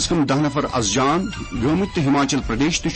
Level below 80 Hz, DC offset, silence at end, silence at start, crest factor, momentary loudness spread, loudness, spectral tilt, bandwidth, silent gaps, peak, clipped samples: -36 dBFS; under 0.1%; 0 s; 0 s; 12 dB; 4 LU; -20 LUFS; -4.5 dB/octave; 8.8 kHz; none; -8 dBFS; under 0.1%